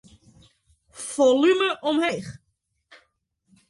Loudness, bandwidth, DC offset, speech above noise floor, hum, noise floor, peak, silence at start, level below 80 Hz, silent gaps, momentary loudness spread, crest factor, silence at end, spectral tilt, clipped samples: -22 LUFS; 11.5 kHz; under 0.1%; 53 dB; none; -74 dBFS; -8 dBFS; 0.95 s; -64 dBFS; none; 17 LU; 18 dB; 1.35 s; -4 dB/octave; under 0.1%